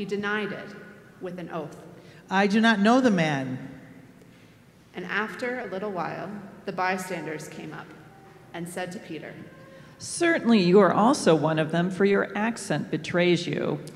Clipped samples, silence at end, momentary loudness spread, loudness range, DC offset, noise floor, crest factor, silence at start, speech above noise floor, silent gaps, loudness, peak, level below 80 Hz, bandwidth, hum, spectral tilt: under 0.1%; 0 s; 20 LU; 11 LU; under 0.1%; -54 dBFS; 20 dB; 0 s; 29 dB; none; -25 LUFS; -6 dBFS; -68 dBFS; 13.5 kHz; none; -5.5 dB/octave